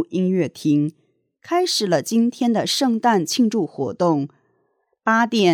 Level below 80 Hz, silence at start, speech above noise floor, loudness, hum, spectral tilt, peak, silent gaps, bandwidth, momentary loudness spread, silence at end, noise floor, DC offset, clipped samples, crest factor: -74 dBFS; 0 s; 49 dB; -20 LUFS; none; -4.5 dB/octave; -4 dBFS; none; 18 kHz; 6 LU; 0 s; -68 dBFS; under 0.1%; under 0.1%; 16 dB